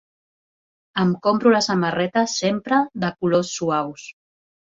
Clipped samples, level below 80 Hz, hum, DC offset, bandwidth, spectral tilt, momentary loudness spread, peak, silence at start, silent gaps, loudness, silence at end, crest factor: under 0.1%; -62 dBFS; none; under 0.1%; 7.8 kHz; -5 dB/octave; 11 LU; -4 dBFS; 0.95 s; none; -20 LUFS; 0.55 s; 18 dB